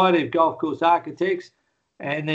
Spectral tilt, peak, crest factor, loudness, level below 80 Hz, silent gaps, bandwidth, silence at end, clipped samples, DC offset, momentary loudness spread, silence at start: -7 dB/octave; -4 dBFS; 18 dB; -22 LUFS; -68 dBFS; none; 7.6 kHz; 0 s; under 0.1%; under 0.1%; 10 LU; 0 s